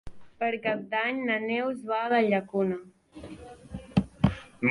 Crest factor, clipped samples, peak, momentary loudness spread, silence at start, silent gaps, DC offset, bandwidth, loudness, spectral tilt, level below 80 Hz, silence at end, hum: 22 dB; under 0.1%; -8 dBFS; 20 LU; 0.05 s; none; under 0.1%; 11.5 kHz; -28 LUFS; -7.5 dB/octave; -48 dBFS; 0 s; none